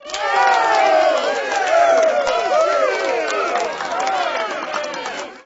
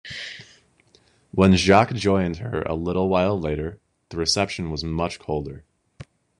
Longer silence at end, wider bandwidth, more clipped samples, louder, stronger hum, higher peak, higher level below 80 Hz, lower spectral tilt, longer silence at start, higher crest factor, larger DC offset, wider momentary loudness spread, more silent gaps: second, 0.05 s vs 0.35 s; second, 8 kHz vs 11 kHz; neither; first, -17 LUFS vs -22 LUFS; neither; about the same, -4 dBFS vs -2 dBFS; second, -60 dBFS vs -44 dBFS; second, -1 dB/octave vs -5.5 dB/octave; about the same, 0 s vs 0.05 s; second, 14 dB vs 22 dB; neither; second, 9 LU vs 17 LU; neither